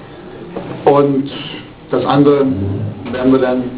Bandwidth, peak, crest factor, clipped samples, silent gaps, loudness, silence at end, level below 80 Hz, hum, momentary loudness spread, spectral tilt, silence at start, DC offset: 4 kHz; 0 dBFS; 14 dB; under 0.1%; none; -14 LUFS; 0 s; -42 dBFS; none; 17 LU; -11.5 dB/octave; 0 s; under 0.1%